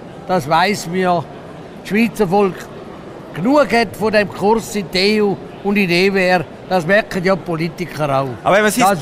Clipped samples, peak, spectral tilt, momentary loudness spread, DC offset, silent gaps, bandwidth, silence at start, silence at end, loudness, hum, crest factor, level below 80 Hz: under 0.1%; -4 dBFS; -5 dB/octave; 17 LU; under 0.1%; none; 15.5 kHz; 0 s; 0 s; -16 LUFS; none; 14 dB; -46 dBFS